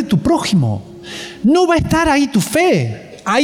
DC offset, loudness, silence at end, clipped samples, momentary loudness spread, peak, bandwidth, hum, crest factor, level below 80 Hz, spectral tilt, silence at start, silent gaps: under 0.1%; -15 LUFS; 0 s; under 0.1%; 13 LU; -4 dBFS; 17.5 kHz; none; 10 dB; -38 dBFS; -5.5 dB/octave; 0 s; none